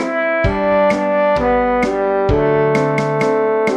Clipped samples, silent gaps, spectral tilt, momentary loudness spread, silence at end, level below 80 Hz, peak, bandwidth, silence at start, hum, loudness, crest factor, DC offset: under 0.1%; none; -7 dB/octave; 2 LU; 0 s; -32 dBFS; -2 dBFS; 10.5 kHz; 0 s; none; -15 LUFS; 12 dB; under 0.1%